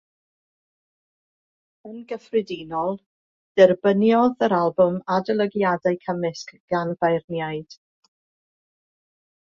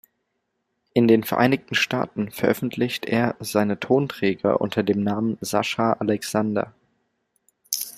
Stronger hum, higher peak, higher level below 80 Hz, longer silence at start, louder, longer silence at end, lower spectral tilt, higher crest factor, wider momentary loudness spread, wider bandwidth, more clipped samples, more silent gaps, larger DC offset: neither; about the same, -2 dBFS vs -2 dBFS; about the same, -66 dBFS vs -62 dBFS; first, 1.85 s vs 0.95 s; about the same, -22 LUFS vs -23 LUFS; first, 1.8 s vs 0 s; first, -7 dB/octave vs -5 dB/octave; about the same, 22 dB vs 20 dB; first, 17 LU vs 7 LU; second, 7.2 kHz vs 16 kHz; neither; first, 3.06-3.55 s, 6.60-6.68 s, 7.24-7.28 s vs none; neither